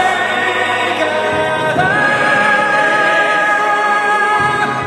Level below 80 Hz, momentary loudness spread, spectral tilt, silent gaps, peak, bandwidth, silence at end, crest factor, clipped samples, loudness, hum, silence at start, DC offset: -52 dBFS; 3 LU; -3.5 dB/octave; none; 0 dBFS; 13.5 kHz; 0 s; 12 dB; under 0.1%; -13 LUFS; none; 0 s; under 0.1%